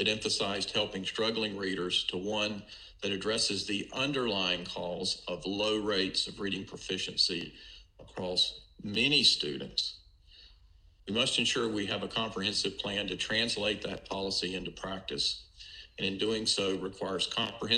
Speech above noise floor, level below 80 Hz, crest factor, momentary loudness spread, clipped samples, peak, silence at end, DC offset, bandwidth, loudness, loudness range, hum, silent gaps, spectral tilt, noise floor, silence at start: 27 dB; -60 dBFS; 22 dB; 10 LU; under 0.1%; -10 dBFS; 0 s; under 0.1%; 12 kHz; -31 LUFS; 4 LU; none; none; -3 dB/octave; -60 dBFS; 0 s